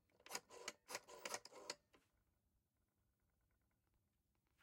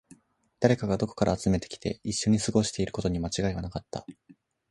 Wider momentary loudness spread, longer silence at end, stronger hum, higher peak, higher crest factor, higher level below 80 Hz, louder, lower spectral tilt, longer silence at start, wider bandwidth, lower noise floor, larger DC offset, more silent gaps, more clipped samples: second, 4 LU vs 11 LU; first, 2.65 s vs 0.6 s; neither; second, -30 dBFS vs -6 dBFS; first, 30 dB vs 22 dB; second, -90 dBFS vs -46 dBFS; second, -53 LUFS vs -28 LUFS; second, 0 dB/octave vs -5.5 dB/octave; second, 0.15 s vs 0.6 s; first, 16.5 kHz vs 11.5 kHz; first, -87 dBFS vs -60 dBFS; neither; neither; neither